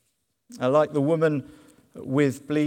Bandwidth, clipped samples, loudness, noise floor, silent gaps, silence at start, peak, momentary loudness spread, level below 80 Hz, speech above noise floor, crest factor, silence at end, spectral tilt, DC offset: 16 kHz; under 0.1%; -24 LUFS; -71 dBFS; none; 0.5 s; -8 dBFS; 9 LU; -68 dBFS; 48 dB; 18 dB; 0 s; -7.5 dB/octave; under 0.1%